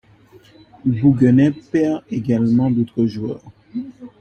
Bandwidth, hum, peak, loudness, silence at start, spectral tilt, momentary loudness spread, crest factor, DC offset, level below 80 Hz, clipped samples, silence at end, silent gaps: 8.2 kHz; none; -2 dBFS; -18 LUFS; 0.85 s; -9.5 dB/octave; 17 LU; 16 dB; under 0.1%; -52 dBFS; under 0.1%; 0.1 s; none